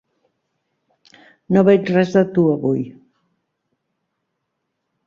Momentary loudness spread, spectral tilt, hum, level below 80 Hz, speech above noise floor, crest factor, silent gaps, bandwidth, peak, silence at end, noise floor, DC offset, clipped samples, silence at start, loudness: 9 LU; -8.5 dB/octave; none; -60 dBFS; 60 dB; 18 dB; none; 7 kHz; -2 dBFS; 2.15 s; -75 dBFS; under 0.1%; under 0.1%; 1.5 s; -16 LUFS